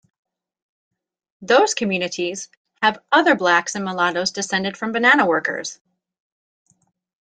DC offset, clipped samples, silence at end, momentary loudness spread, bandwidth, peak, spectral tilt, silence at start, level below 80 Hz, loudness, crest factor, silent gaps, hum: under 0.1%; under 0.1%; 1.5 s; 11 LU; 9.6 kHz; -2 dBFS; -3 dB/octave; 1.4 s; -66 dBFS; -19 LUFS; 20 dB; 2.57-2.65 s; none